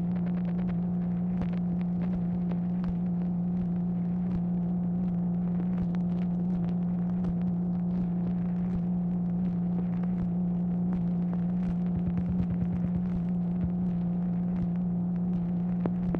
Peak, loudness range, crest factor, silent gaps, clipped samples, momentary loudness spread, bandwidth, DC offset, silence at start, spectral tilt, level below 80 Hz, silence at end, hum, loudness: -14 dBFS; 1 LU; 14 dB; none; under 0.1%; 1 LU; 3 kHz; under 0.1%; 0 s; -12 dB/octave; -48 dBFS; 0 s; none; -30 LUFS